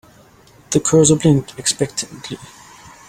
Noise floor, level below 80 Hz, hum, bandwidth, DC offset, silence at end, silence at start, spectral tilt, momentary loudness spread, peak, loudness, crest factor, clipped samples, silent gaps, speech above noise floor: -48 dBFS; -48 dBFS; none; 16 kHz; under 0.1%; 0.65 s; 0.7 s; -4.5 dB/octave; 19 LU; 0 dBFS; -16 LUFS; 18 dB; under 0.1%; none; 31 dB